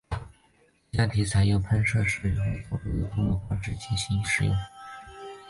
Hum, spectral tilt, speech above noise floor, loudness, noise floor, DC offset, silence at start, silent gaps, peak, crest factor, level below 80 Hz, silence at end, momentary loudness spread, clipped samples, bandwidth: none; -5.5 dB/octave; 38 dB; -27 LUFS; -63 dBFS; under 0.1%; 0.1 s; none; -12 dBFS; 16 dB; -40 dBFS; 0 s; 15 LU; under 0.1%; 11.5 kHz